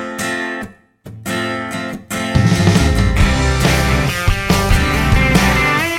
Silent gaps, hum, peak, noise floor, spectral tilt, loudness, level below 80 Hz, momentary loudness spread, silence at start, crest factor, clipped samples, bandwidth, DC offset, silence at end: none; none; 0 dBFS; -37 dBFS; -5 dB/octave; -15 LUFS; -20 dBFS; 11 LU; 0 s; 14 dB; under 0.1%; 17 kHz; under 0.1%; 0 s